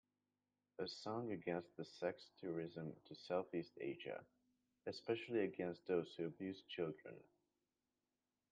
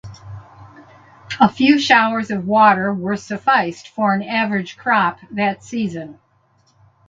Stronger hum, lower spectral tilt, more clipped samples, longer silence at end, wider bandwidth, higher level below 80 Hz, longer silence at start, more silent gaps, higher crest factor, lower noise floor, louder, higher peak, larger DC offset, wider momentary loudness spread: neither; about the same, -6.5 dB/octave vs -5.5 dB/octave; neither; first, 1.3 s vs 0.95 s; first, 9 kHz vs 7.8 kHz; second, -88 dBFS vs -56 dBFS; first, 0.8 s vs 0.05 s; neither; about the same, 20 dB vs 18 dB; first, under -90 dBFS vs -59 dBFS; second, -47 LUFS vs -17 LUFS; second, -28 dBFS vs 0 dBFS; neither; second, 12 LU vs 19 LU